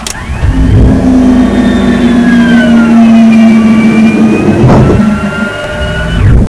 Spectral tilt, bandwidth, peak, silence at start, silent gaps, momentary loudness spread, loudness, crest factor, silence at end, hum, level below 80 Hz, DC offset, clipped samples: -7 dB/octave; 11 kHz; 0 dBFS; 0 s; none; 10 LU; -6 LUFS; 4 dB; 0 s; none; -16 dBFS; under 0.1%; 10%